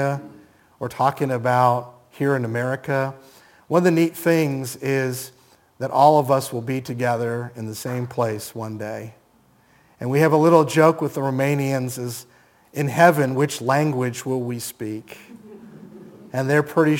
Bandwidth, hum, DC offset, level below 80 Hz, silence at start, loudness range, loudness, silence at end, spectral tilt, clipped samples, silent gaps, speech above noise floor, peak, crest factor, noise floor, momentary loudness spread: 17 kHz; none; under 0.1%; -68 dBFS; 0 s; 5 LU; -21 LUFS; 0 s; -6 dB/octave; under 0.1%; none; 37 dB; 0 dBFS; 20 dB; -57 dBFS; 16 LU